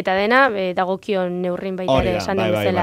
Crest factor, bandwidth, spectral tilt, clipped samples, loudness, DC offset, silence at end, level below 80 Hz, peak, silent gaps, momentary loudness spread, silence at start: 18 dB; 16 kHz; -6 dB/octave; under 0.1%; -19 LUFS; under 0.1%; 0 s; -40 dBFS; 0 dBFS; none; 8 LU; 0 s